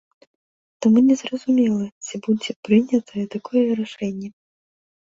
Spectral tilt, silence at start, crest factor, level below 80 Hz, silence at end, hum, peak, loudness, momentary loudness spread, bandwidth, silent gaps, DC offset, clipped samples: -6 dB/octave; 0.8 s; 16 dB; -64 dBFS; 0.75 s; none; -4 dBFS; -21 LUFS; 13 LU; 7.8 kHz; 1.92-2.01 s, 2.56-2.63 s; under 0.1%; under 0.1%